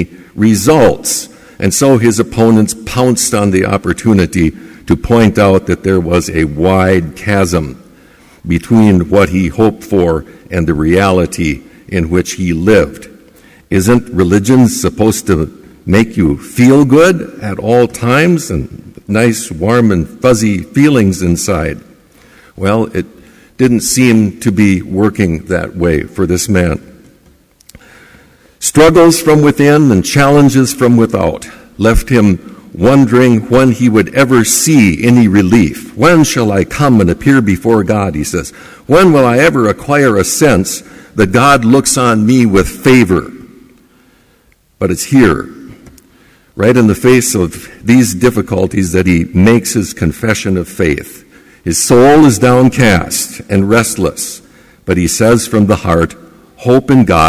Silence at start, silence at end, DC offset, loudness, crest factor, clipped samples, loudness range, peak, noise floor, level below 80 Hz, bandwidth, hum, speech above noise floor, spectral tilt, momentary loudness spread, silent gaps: 0 s; 0 s; under 0.1%; -10 LUFS; 10 dB; under 0.1%; 4 LU; 0 dBFS; -50 dBFS; -28 dBFS; 16 kHz; none; 41 dB; -5.5 dB/octave; 10 LU; none